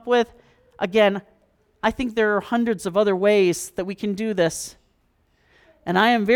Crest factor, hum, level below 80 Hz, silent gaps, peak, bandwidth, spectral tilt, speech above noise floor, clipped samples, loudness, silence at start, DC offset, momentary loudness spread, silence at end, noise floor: 16 dB; none; -54 dBFS; none; -6 dBFS; 18 kHz; -4.5 dB/octave; 44 dB; under 0.1%; -22 LUFS; 0.05 s; under 0.1%; 12 LU; 0 s; -64 dBFS